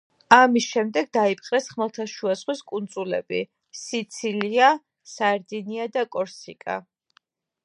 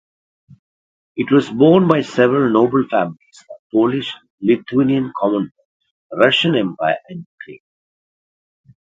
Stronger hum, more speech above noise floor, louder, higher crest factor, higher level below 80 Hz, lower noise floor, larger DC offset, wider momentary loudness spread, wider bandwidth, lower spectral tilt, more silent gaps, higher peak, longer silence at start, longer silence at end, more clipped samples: neither; second, 42 dB vs over 74 dB; second, -23 LUFS vs -16 LUFS; first, 24 dB vs 18 dB; second, -72 dBFS vs -60 dBFS; second, -65 dBFS vs under -90 dBFS; neither; second, 15 LU vs 18 LU; first, 11 kHz vs 7.8 kHz; second, -3.5 dB/octave vs -7 dB/octave; second, none vs 3.59-3.70 s, 4.30-4.38 s, 5.65-5.80 s, 5.91-6.10 s, 7.26-7.38 s; about the same, 0 dBFS vs 0 dBFS; second, 0.3 s vs 1.15 s; second, 0.85 s vs 1.3 s; neither